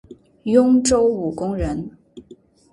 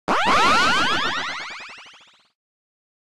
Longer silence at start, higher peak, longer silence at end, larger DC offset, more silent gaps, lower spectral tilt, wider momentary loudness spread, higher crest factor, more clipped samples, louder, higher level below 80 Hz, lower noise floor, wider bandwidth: about the same, 0.1 s vs 0.05 s; first, -2 dBFS vs -8 dBFS; second, 0.5 s vs 0.65 s; neither; neither; first, -5.5 dB/octave vs -2 dB/octave; second, 15 LU vs 18 LU; about the same, 18 dB vs 16 dB; neither; about the same, -18 LUFS vs -19 LUFS; first, -40 dBFS vs -50 dBFS; about the same, -48 dBFS vs -50 dBFS; second, 11.5 kHz vs 16 kHz